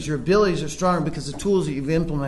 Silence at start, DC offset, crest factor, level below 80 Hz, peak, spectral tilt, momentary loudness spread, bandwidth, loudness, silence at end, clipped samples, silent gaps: 0 s; under 0.1%; 14 dB; -38 dBFS; -8 dBFS; -6 dB/octave; 6 LU; 12 kHz; -22 LUFS; 0 s; under 0.1%; none